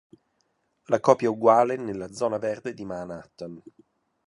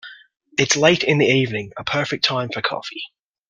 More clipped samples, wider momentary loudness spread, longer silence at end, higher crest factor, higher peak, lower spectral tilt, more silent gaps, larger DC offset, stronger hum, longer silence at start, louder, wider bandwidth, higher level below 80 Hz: neither; first, 19 LU vs 14 LU; first, 0.7 s vs 0.45 s; about the same, 24 dB vs 20 dB; about the same, -2 dBFS vs 0 dBFS; first, -6 dB/octave vs -3.5 dB/octave; neither; neither; neither; first, 0.9 s vs 0.05 s; second, -24 LUFS vs -19 LUFS; first, 11.5 kHz vs 10 kHz; second, -66 dBFS vs -58 dBFS